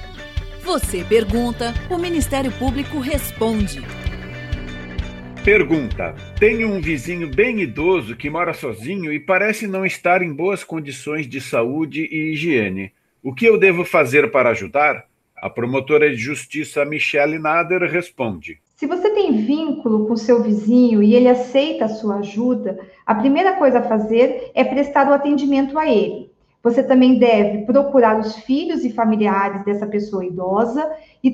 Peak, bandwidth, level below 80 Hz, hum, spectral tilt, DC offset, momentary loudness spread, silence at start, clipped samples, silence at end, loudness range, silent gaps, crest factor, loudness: -2 dBFS; 15.5 kHz; -36 dBFS; none; -6 dB/octave; under 0.1%; 14 LU; 0 s; under 0.1%; 0 s; 5 LU; none; 16 dB; -18 LUFS